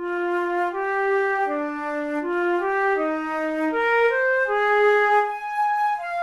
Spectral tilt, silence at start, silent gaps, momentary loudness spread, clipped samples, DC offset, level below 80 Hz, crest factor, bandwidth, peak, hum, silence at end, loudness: -4 dB/octave; 0 s; none; 7 LU; under 0.1%; under 0.1%; -60 dBFS; 12 dB; 12 kHz; -10 dBFS; none; 0 s; -22 LUFS